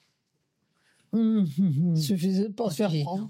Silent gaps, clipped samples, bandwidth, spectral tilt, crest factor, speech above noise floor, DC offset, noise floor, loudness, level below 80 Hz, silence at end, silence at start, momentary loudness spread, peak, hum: none; under 0.1%; 16.5 kHz; -7.5 dB/octave; 10 dB; 51 dB; under 0.1%; -76 dBFS; -26 LUFS; -74 dBFS; 0 s; 1.15 s; 4 LU; -16 dBFS; none